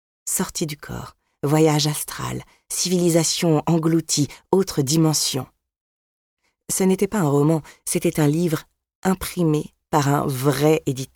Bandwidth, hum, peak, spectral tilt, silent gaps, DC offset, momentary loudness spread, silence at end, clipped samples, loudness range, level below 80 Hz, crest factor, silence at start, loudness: 19 kHz; none; -2 dBFS; -5 dB/octave; 5.81-6.37 s, 8.95-9.02 s; under 0.1%; 11 LU; 0.1 s; under 0.1%; 2 LU; -52 dBFS; 18 dB; 0.25 s; -21 LUFS